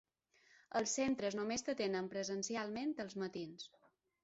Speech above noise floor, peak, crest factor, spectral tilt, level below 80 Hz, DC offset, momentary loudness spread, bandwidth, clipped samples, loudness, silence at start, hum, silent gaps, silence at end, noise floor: 32 dB; -24 dBFS; 16 dB; -3.5 dB/octave; -76 dBFS; under 0.1%; 10 LU; 8 kHz; under 0.1%; -40 LUFS; 0.7 s; none; none; 0.55 s; -72 dBFS